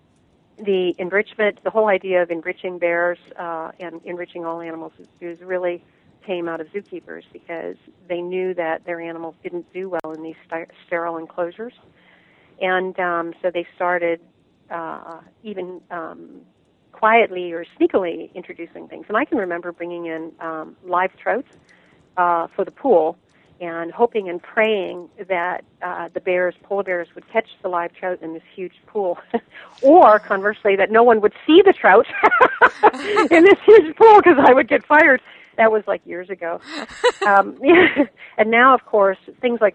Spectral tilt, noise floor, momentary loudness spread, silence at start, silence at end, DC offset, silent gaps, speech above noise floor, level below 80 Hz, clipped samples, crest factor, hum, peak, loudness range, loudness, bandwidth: -5.5 dB/octave; -58 dBFS; 20 LU; 0.6 s; 0.05 s; under 0.1%; none; 40 dB; -62 dBFS; under 0.1%; 18 dB; none; 0 dBFS; 16 LU; -17 LUFS; 9 kHz